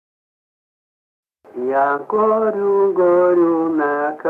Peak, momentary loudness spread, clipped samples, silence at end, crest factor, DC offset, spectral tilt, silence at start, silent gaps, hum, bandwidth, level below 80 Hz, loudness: -6 dBFS; 6 LU; under 0.1%; 0 s; 12 dB; under 0.1%; -9 dB/octave; 1.55 s; none; none; 3.8 kHz; -68 dBFS; -17 LUFS